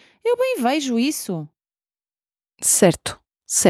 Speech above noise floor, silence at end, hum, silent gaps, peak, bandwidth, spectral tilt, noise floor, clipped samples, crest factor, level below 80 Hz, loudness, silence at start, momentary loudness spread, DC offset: over 70 dB; 0 s; none; none; -2 dBFS; 16.5 kHz; -3.5 dB/octave; under -90 dBFS; under 0.1%; 20 dB; -58 dBFS; -20 LUFS; 0.25 s; 15 LU; under 0.1%